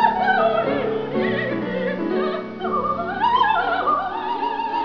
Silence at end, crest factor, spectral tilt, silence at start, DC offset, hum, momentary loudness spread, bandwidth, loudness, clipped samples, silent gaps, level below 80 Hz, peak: 0 s; 18 dB; -7 dB/octave; 0 s; 0.4%; none; 7 LU; 5.4 kHz; -21 LUFS; under 0.1%; none; -54 dBFS; -4 dBFS